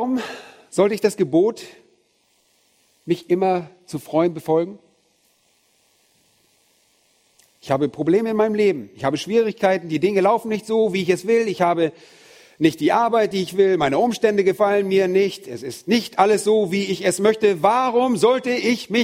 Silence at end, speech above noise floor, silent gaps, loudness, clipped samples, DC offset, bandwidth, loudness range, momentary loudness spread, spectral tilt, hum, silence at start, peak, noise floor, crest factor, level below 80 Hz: 0 s; 44 dB; none; -19 LUFS; under 0.1%; under 0.1%; 16 kHz; 8 LU; 8 LU; -5.5 dB/octave; none; 0 s; -2 dBFS; -63 dBFS; 18 dB; -64 dBFS